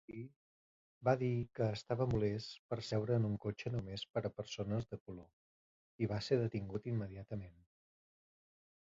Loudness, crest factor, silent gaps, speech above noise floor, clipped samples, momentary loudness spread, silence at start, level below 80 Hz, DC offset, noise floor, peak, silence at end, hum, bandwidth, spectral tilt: -39 LUFS; 20 dB; 0.36-1.01 s, 2.59-2.69 s, 4.10-4.14 s, 5.00-5.06 s, 5.33-5.99 s; over 51 dB; under 0.1%; 14 LU; 0.1 s; -62 dBFS; under 0.1%; under -90 dBFS; -20 dBFS; 1.3 s; none; 7.6 kHz; -6.5 dB/octave